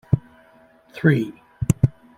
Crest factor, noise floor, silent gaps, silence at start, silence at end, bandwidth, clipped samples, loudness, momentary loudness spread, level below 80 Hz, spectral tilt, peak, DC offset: 20 dB; -53 dBFS; none; 0.1 s; 0.3 s; 12.5 kHz; under 0.1%; -22 LUFS; 12 LU; -42 dBFS; -7.5 dB/octave; -2 dBFS; under 0.1%